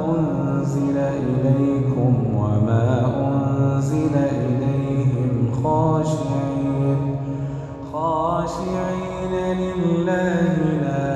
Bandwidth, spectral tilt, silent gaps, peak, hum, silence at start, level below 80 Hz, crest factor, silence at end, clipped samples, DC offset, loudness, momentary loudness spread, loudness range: 9 kHz; -8.5 dB/octave; none; -6 dBFS; none; 0 s; -44 dBFS; 14 dB; 0 s; under 0.1%; under 0.1%; -21 LUFS; 6 LU; 4 LU